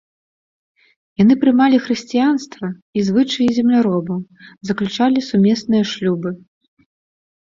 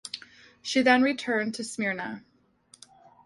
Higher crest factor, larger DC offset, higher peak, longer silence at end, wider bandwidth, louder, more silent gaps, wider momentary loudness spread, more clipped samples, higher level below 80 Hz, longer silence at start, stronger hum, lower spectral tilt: second, 16 dB vs 22 dB; neither; first, -2 dBFS vs -8 dBFS; first, 1.25 s vs 1.05 s; second, 7.6 kHz vs 11.5 kHz; first, -17 LUFS vs -26 LUFS; first, 2.82-2.93 s vs none; second, 15 LU vs 18 LU; neither; first, -58 dBFS vs -70 dBFS; first, 1.2 s vs 0.05 s; neither; first, -6.5 dB/octave vs -3.5 dB/octave